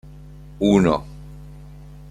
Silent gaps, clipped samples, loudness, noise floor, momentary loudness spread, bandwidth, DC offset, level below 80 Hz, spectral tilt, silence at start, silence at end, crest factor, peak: none; under 0.1%; -19 LUFS; -41 dBFS; 26 LU; 10.5 kHz; under 0.1%; -42 dBFS; -7 dB/octave; 0.2 s; 0.15 s; 18 dB; -4 dBFS